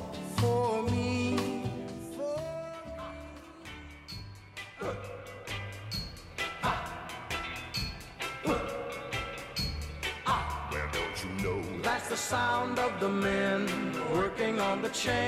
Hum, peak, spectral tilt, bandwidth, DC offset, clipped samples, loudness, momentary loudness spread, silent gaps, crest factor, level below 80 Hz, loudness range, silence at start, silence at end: none; -16 dBFS; -4.5 dB/octave; 16 kHz; under 0.1%; under 0.1%; -33 LUFS; 14 LU; none; 16 dB; -48 dBFS; 10 LU; 0 s; 0 s